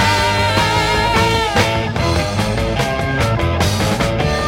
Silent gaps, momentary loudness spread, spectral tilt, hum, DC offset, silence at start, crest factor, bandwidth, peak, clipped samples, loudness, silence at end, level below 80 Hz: none; 4 LU; -4.5 dB/octave; none; under 0.1%; 0 s; 14 dB; 16.5 kHz; -2 dBFS; under 0.1%; -16 LUFS; 0 s; -28 dBFS